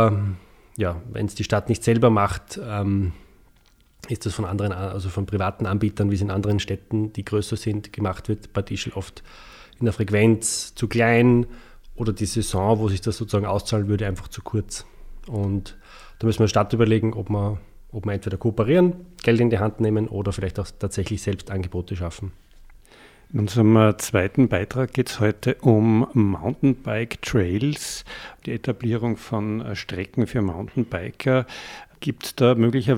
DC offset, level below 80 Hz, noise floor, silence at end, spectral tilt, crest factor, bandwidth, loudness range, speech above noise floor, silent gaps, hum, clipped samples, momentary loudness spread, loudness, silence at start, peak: under 0.1%; -44 dBFS; -56 dBFS; 0 s; -6.5 dB/octave; 20 dB; 15.5 kHz; 6 LU; 34 dB; none; none; under 0.1%; 12 LU; -23 LUFS; 0 s; -2 dBFS